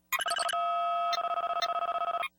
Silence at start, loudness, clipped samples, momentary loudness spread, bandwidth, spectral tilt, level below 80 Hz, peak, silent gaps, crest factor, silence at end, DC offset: 0.1 s; -30 LUFS; under 0.1%; 2 LU; 19.5 kHz; 1 dB/octave; -76 dBFS; -16 dBFS; none; 16 dB; 0.1 s; under 0.1%